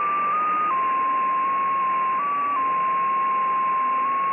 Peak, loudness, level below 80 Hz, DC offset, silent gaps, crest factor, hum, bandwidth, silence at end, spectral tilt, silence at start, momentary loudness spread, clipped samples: -16 dBFS; -22 LUFS; -70 dBFS; under 0.1%; none; 6 dB; none; 3.6 kHz; 0 s; -7.5 dB/octave; 0 s; 1 LU; under 0.1%